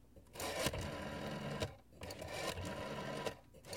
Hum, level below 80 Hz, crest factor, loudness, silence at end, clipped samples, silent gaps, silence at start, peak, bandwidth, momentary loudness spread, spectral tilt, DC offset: none; -60 dBFS; 24 dB; -44 LUFS; 0 s; under 0.1%; none; 0 s; -22 dBFS; 16.5 kHz; 11 LU; -4 dB/octave; under 0.1%